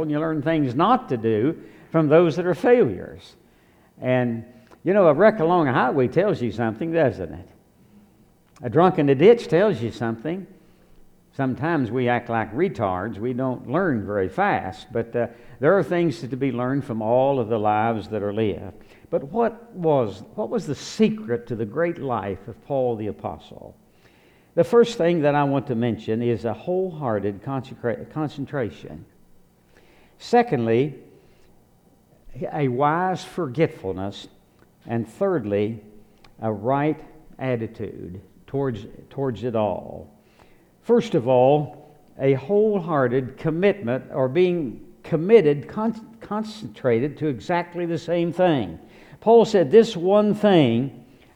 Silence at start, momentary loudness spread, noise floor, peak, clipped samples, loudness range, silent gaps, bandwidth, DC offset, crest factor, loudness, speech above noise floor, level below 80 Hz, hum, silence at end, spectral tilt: 0 s; 15 LU; -57 dBFS; -2 dBFS; under 0.1%; 7 LU; none; 11 kHz; under 0.1%; 20 dB; -22 LUFS; 35 dB; -56 dBFS; none; 0.35 s; -7.5 dB/octave